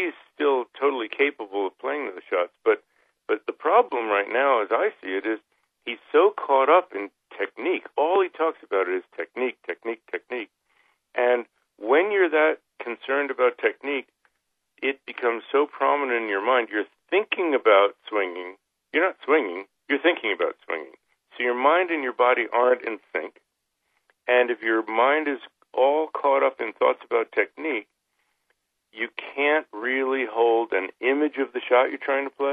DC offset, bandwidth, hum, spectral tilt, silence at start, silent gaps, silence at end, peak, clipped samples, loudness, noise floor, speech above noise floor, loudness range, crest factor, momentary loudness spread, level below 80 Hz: under 0.1%; 4.6 kHz; none; -5.5 dB/octave; 0 s; none; 0 s; -4 dBFS; under 0.1%; -24 LUFS; -77 dBFS; 51 dB; 4 LU; 20 dB; 12 LU; -80 dBFS